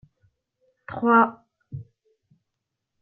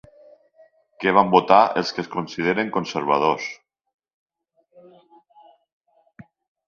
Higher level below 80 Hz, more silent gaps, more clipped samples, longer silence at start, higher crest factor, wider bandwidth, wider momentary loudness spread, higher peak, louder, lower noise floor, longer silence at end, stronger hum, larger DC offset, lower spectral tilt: about the same, -66 dBFS vs -64 dBFS; neither; neither; about the same, 0.9 s vs 1 s; about the same, 22 dB vs 24 dB; second, 3.9 kHz vs 7.4 kHz; first, 23 LU vs 13 LU; second, -6 dBFS vs 0 dBFS; about the same, -20 LUFS vs -20 LUFS; first, -82 dBFS vs -66 dBFS; second, 1.2 s vs 3.15 s; neither; neither; first, -10.5 dB/octave vs -5.5 dB/octave